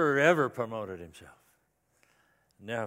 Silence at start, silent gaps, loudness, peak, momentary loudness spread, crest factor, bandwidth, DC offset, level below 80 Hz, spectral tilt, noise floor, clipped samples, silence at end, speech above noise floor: 0 s; none; -29 LUFS; -8 dBFS; 24 LU; 24 dB; 16 kHz; under 0.1%; -70 dBFS; -5.5 dB/octave; -73 dBFS; under 0.1%; 0 s; 44 dB